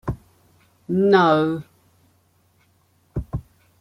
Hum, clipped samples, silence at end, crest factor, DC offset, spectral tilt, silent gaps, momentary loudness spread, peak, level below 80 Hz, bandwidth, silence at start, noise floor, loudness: none; under 0.1%; 0.4 s; 20 dB; under 0.1%; -8 dB/octave; none; 18 LU; -4 dBFS; -44 dBFS; 10 kHz; 0.05 s; -62 dBFS; -20 LUFS